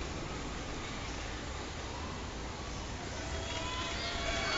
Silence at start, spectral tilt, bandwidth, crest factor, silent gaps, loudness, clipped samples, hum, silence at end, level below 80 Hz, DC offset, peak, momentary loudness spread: 0 s; -3.5 dB/octave; 8.2 kHz; 16 dB; none; -39 LUFS; under 0.1%; none; 0 s; -46 dBFS; under 0.1%; -22 dBFS; 6 LU